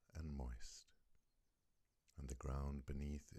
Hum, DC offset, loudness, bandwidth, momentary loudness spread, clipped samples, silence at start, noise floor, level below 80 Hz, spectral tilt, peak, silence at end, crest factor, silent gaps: none; under 0.1%; -51 LUFS; 12.5 kHz; 12 LU; under 0.1%; 0.15 s; -83 dBFS; -54 dBFS; -6 dB/octave; -34 dBFS; 0 s; 16 dB; none